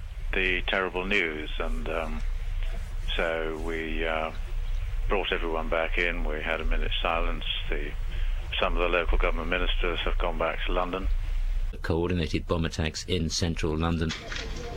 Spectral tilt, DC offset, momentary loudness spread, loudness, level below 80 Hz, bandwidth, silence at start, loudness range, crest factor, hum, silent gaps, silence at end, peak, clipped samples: -5 dB/octave; under 0.1%; 9 LU; -29 LUFS; -30 dBFS; 9.6 kHz; 0 s; 3 LU; 16 dB; none; none; 0 s; -10 dBFS; under 0.1%